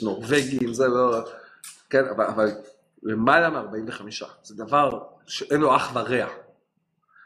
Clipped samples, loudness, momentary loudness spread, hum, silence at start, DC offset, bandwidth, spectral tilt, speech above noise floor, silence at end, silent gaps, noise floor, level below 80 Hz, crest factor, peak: under 0.1%; -23 LUFS; 19 LU; none; 0 s; under 0.1%; 14.5 kHz; -5 dB/octave; 49 dB; 0.85 s; none; -72 dBFS; -62 dBFS; 20 dB; -4 dBFS